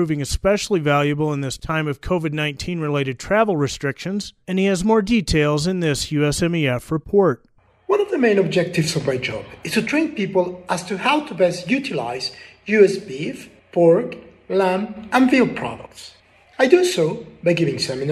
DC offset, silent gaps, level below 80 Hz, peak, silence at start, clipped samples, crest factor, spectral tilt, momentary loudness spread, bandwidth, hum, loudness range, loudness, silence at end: under 0.1%; none; -42 dBFS; 0 dBFS; 0 s; under 0.1%; 20 dB; -5.5 dB/octave; 11 LU; 15.5 kHz; none; 2 LU; -20 LUFS; 0 s